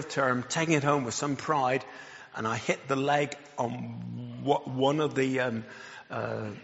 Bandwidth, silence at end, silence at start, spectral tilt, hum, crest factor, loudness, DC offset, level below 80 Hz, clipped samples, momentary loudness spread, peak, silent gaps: 8 kHz; 0 s; 0 s; -4.5 dB/octave; none; 20 dB; -29 LUFS; under 0.1%; -68 dBFS; under 0.1%; 13 LU; -10 dBFS; none